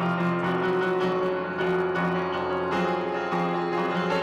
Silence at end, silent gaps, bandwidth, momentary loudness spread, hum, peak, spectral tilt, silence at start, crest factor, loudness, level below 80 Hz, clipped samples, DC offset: 0 s; none; 8.8 kHz; 3 LU; none; -18 dBFS; -7 dB/octave; 0 s; 8 dB; -26 LUFS; -62 dBFS; under 0.1%; under 0.1%